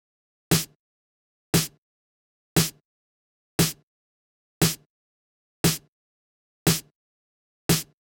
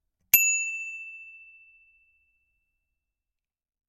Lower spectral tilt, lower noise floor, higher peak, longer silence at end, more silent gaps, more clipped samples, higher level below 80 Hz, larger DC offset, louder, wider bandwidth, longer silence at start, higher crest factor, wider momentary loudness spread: first, -3.5 dB/octave vs 2.5 dB/octave; about the same, under -90 dBFS vs -90 dBFS; second, -8 dBFS vs -4 dBFS; second, 0.35 s vs 2.45 s; first, 0.75-1.53 s, 1.78-2.56 s, 2.85-3.59 s, 3.83-4.61 s, 4.86-5.64 s, 5.88-6.66 s, 6.95-7.69 s vs none; neither; first, -52 dBFS vs -72 dBFS; neither; second, -25 LUFS vs -22 LUFS; first, 18 kHz vs 14 kHz; first, 0.5 s vs 0.35 s; second, 22 dB vs 28 dB; second, 9 LU vs 24 LU